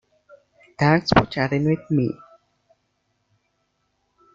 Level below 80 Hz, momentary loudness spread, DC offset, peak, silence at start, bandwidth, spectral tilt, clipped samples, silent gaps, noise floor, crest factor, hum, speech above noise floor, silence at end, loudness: -48 dBFS; 8 LU; under 0.1%; -2 dBFS; 0.8 s; 7.4 kHz; -7 dB/octave; under 0.1%; none; -71 dBFS; 22 dB; 50 Hz at -45 dBFS; 52 dB; 2.2 s; -21 LUFS